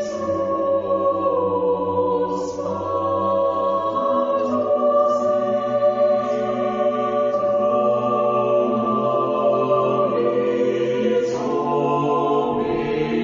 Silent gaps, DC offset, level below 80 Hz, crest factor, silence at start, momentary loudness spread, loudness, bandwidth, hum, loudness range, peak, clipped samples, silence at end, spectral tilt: none; under 0.1%; -56 dBFS; 12 dB; 0 s; 4 LU; -20 LUFS; 7.6 kHz; none; 2 LU; -6 dBFS; under 0.1%; 0 s; -7 dB/octave